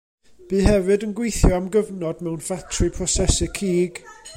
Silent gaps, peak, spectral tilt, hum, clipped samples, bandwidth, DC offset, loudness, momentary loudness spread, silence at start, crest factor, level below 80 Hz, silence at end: none; -2 dBFS; -5 dB/octave; none; under 0.1%; 16 kHz; under 0.1%; -22 LUFS; 9 LU; 0.4 s; 18 dB; -28 dBFS; 0 s